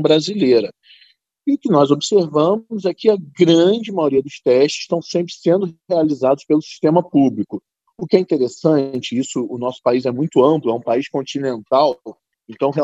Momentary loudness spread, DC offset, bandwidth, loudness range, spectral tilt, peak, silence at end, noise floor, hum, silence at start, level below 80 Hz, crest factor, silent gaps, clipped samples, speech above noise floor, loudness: 9 LU; under 0.1%; 8.2 kHz; 2 LU; -6 dB/octave; 0 dBFS; 0 s; -54 dBFS; none; 0 s; -66 dBFS; 16 dB; none; under 0.1%; 38 dB; -17 LUFS